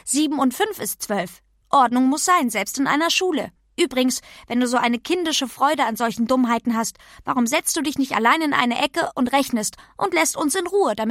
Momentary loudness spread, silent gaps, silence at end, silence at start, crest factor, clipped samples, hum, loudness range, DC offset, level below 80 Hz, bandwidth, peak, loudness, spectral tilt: 8 LU; none; 0 s; 0.05 s; 20 dB; under 0.1%; none; 1 LU; under 0.1%; -58 dBFS; 16 kHz; -2 dBFS; -20 LUFS; -2.5 dB/octave